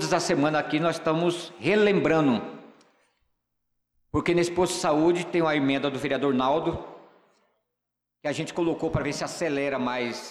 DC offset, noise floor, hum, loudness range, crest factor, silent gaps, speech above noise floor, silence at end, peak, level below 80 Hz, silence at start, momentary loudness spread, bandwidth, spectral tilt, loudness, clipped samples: under 0.1%; -84 dBFS; 60 Hz at -60 dBFS; 5 LU; 14 dB; none; 59 dB; 0 s; -12 dBFS; -54 dBFS; 0 s; 8 LU; 13.5 kHz; -5 dB/octave; -25 LUFS; under 0.1%